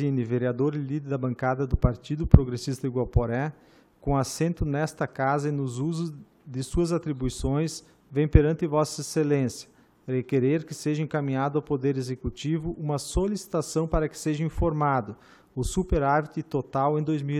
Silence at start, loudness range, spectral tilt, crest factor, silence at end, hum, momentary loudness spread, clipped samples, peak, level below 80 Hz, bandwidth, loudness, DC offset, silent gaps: 0 s; 3 LU; -7 dB/octave; 26 dB; 0 s; none; 8 LU; under 0.1%; 0 dBFS; -36 dBFS; 14 kHz; -27 LUFS; under 0.1%; none